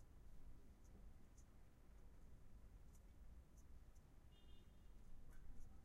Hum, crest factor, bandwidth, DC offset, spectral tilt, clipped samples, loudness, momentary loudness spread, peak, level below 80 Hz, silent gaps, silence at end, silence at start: none; 16 dB; 14 kHz; under 0.1%; -5.5 dB/octave; under 0.1%; -68 LUFS; 3 LU; -44 dBFS; -62 dBFS; none; 0 s; 0 s